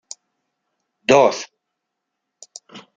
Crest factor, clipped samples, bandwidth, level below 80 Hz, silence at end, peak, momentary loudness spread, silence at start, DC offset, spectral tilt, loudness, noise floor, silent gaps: 22 dB; under 0.1%; 9.4 kHz; -64 dBFS; 0.2 s; -2 dBFS; 25 LU; 1.1 s; under 0.1%; -3.5 dB/octave; -16 LUFS; -79 dBFS; none